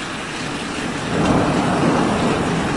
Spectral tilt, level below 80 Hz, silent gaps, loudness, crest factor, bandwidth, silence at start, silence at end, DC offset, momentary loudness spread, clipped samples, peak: -5.5 dB/octave; -40 dBFS; none; -19 LUFS; 16 dB; 11.5 kHz; 0 s; 0 s; under 0.1%; 8 LU; under 0.1%; -4 dBFS